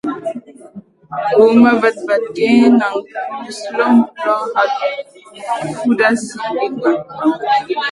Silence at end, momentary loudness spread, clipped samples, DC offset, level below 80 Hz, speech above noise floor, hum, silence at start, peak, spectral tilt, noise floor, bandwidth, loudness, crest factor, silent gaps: 0 s; 15 LU; under 0.1%; under 0.1%; -60 dBFS; 23 dB; none; 0.05 s; 0 dBFS; -5 dB/octave; -38 dBFS; 11.5 kHz; -15 LUFS; 14 dB; none